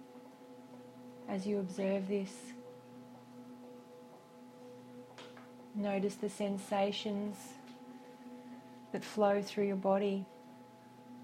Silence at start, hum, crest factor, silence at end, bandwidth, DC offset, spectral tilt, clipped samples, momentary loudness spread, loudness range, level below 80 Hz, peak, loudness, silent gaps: 0 s; none; 22 dB; 0 s; 15.5 kHz; under 0.1%; -6 dB/octave; under 0.1%; 22 LU; 10 LU; -82 dBFS; -18 dBFS; -36 LUFS; none